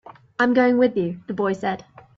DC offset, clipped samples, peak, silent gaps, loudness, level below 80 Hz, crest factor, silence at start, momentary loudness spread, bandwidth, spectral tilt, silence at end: under 0.1%; under 0.1%; -6 dBFS; none; -21 LUFS; -62 dBFS; 16 dB; 0.05 s; 13 LU; 7.6 kHz; -7 dB/octave; 0.4 s